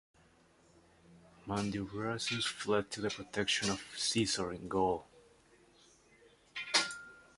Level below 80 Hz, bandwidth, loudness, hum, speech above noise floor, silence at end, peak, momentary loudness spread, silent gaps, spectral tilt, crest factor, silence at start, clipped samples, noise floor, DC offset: -64 dBFS; 11.5 kHz; -35 LUFS; none; 31 dB; 0.15 s; -14 dBFS; 9 LU; none; -3 dB/octave; 24 dB; 1.1 s; under 0.1%; -66 dBFS; under 0.1%